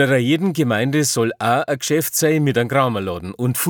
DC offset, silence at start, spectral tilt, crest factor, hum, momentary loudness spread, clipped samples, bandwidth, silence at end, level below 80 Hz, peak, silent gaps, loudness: under 0.1%; 0 s; -4.5 dB/octave; 16 dB; none; 5 LU; under 0.1%; 19 kHz; 0 s; -56 dBFS; -2 dBFS; none; -18 LUFS